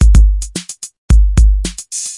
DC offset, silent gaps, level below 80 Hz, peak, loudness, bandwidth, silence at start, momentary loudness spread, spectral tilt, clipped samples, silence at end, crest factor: under 0.1%; 0.98-1.09 s; -10 dBFS; 0 dBFS; -14 LUFS; 11.5 kHz; 0 s; 15 LU; -5 dB/octave; under 0.1%; 0 s; 10 dB